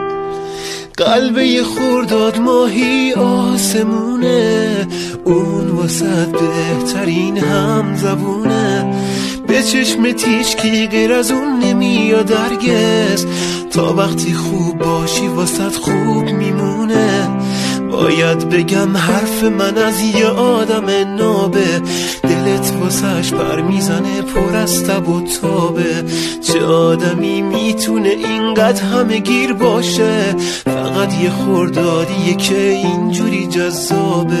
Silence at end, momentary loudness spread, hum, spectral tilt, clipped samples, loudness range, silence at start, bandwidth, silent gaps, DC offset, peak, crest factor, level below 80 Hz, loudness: 0 s; 4 LU; none; -5 dB/octave; under 0.1%; 2 LU; 0 s; 14 kHz; none; under 0.1%; 0 dBFS; 14 dB; -42 dBFS; -14 LUFS